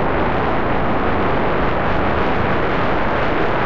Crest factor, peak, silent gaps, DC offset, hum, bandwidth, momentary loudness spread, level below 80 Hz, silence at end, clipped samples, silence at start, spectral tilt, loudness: 10 dB; -6 dBFS; none; 9%; none; 7.4 kHz; 1 LU; -30 dBFS; 0 s; under 0.1%; 0 s; -8 dB/octave; -18 LUFS